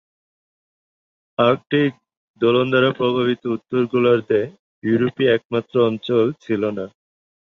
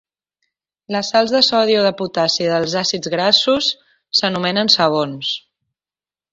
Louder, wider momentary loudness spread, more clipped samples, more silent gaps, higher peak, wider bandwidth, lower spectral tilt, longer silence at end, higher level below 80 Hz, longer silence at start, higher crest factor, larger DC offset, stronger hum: second, -19 LUFS vs -16 LUFS; about the same, 8 LU vs 10 LU; neither; first, 2.17-2.34 s, 4.59-4.82 s, 5.45-5.50 s vs none; about the same, -2 dBFS vs 0 dBFS; second, 6.6 kHz vs 7.8 kHz; first, -8 dB/octave vs -3.5 dB/octave; second, 0.7 s vs 0.95 s; about the same, -62 dBFS vs -62 dBFS; first, 1.4 s vs 0.9 s; about the same, 18 dB vs 18 dB; neither; neither